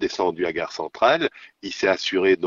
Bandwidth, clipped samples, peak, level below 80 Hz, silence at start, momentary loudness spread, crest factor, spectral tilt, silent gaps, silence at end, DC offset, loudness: 7.4 kHz; under 0.1%; -4 dBFS; -58 dBFS; 0 s; 11 LU; 18 dB; -4 dB/octave; none; 0 s; under 0.1%; -22 LUFS